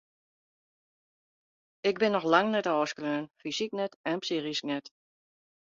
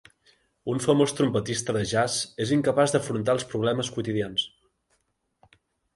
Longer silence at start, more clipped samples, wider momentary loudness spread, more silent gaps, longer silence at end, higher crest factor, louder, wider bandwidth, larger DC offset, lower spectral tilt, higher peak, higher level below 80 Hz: first, 1.85 s vs 0.65 s; neither; first, 10 LU vs 7 LU; first, 3.96-4.04 s vs none; second, 0.8 s vs 1.5 s; first, 24 dB vs 18 dB; second, -30 LUFS vs -25 LUFS; second, 7.6 kHz vs 11.5 kHz; neither; about the same, -4.5 dB/octave vs -4.5 dB/octave; about the same, -8 dBFS vs -8 dBFS; second, -78 dBFS vs -58 dBFS